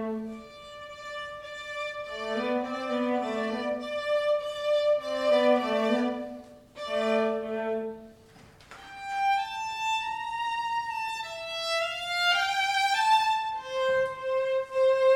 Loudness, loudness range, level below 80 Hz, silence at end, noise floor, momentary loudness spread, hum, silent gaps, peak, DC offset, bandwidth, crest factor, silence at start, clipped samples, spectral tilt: -28 LUFS; 6 LU; -64 dBFS; 0 s; -53 dBFS; 15 LU; none; none; -12 dBFS; under 0.1%; 17 kHz; 16 dB; 0 s; under 0.1%; -3 dB/octave